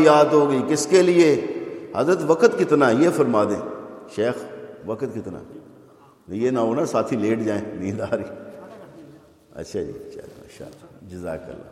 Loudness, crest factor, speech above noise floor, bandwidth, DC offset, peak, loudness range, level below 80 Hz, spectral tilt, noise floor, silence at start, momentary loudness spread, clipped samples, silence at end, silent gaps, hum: -21 LUFS; 20 dB; 30 dB; 13.5 kHz; under 0.1%; -2 dBFS; 14 LU; -62 dBFS; -5.5 dB/octave; -50 dBFS; 0 s; 22 LU; under 0.1%; 0 s; none; none